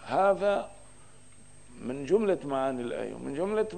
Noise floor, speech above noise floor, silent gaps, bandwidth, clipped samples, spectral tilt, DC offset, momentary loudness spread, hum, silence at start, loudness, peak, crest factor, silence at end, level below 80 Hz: -56 dBFS; 27 dB; none; 10 kHz; under 0.1%; -6 dB/octave; 0.3%; 13 LU; 50 Hz at -60 dBFS; 0 s; -29 LUFS; -12 dBFS; 18 dB; 0 s; -62 dBFS